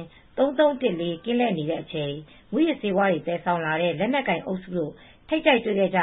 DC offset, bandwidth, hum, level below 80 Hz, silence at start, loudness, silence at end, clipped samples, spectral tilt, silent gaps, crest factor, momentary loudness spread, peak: under 0.1%; 4.1 kHz; none; -58 dBFS; 0 s; -24 LUFS; 0 s; under 0.1%; -10.5 dB/octave; none; 18 dB; 10 LU; -6 dBFS